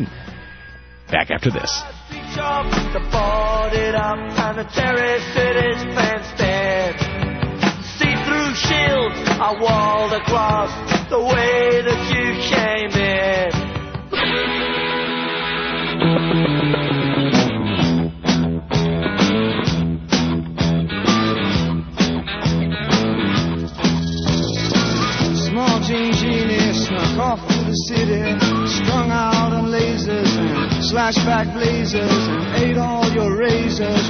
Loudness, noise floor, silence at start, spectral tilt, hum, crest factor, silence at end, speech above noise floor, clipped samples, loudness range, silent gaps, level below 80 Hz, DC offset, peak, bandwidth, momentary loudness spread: -18 LUFS; -39 dBFS; 0 s; -5 dB/octave; none; 18 dB; 0 s; 22 dB; under 0.1%; 2 LU; none; -34 dBFS; under 0.1%; -2 dBFS; 6.6 kHz; 5 LU